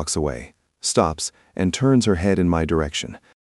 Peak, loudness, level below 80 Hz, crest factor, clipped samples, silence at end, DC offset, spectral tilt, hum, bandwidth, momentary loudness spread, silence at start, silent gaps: -2 dBFS; -21 LUFS; -38 dBFS; 18 dB; under 0.1%; 0.3 s; under 0.1%; -5 dB/octave; none; 12 kHz; 11 LU; 0 s; none